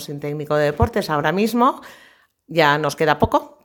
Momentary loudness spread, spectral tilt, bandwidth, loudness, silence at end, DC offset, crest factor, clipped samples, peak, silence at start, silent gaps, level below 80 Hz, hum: 8 LU; -5.5 dB/octave; 19 kHz; -19 LUFS; 0.2 s; under 0.1%; 20 dB; under 0.1%; 0 dBFS; 0 s; none; -38 dBFS; none